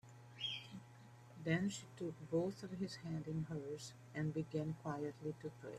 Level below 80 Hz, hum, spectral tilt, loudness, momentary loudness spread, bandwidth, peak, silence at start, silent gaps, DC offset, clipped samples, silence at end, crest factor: -74 dBFS; none; -6 dB/octave; -44 LUFS; 14 LU; 13.5 kHz; -24 dBFS; 0.05 s; none; under 0.1%; under 0.1%; 0 s; 20 dB